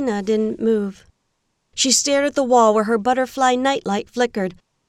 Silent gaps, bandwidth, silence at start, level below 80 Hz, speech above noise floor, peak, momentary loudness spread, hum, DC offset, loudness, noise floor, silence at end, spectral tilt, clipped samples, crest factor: none; 15.5 kHz; 0 s; -56 dBFS; 52 dB; -4 dBFS; 10 LU; none; under 0.1%; -18 LUFS; -71 dBFS; 0.35 s; -3 dB/octave; under 0.1%; 16 dB